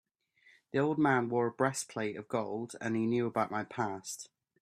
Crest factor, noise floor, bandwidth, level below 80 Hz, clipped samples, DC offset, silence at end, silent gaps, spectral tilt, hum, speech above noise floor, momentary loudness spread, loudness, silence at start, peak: 20 dB; -67 dBFS; 14 kHz; -76 dBFS; under 0.1%; under 0.1%; 0.35 s; none; -5.5 dB/octave; none; 34 dB; 11 LU; -33 LUFS; 0.75 s; -14 dBFS